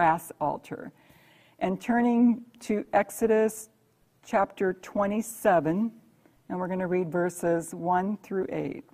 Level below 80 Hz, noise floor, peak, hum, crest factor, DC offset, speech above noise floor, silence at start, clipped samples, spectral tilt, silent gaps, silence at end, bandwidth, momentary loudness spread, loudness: -64 dBFS; -66 dBFS; -10 dBFS; none; 18 dB; under 0.1%; 39 dB; 0 s; under 0.1%; -6.5 dB/octave; none; 0.1 s; 15.5 kHz; 10 LU; -28 LUFS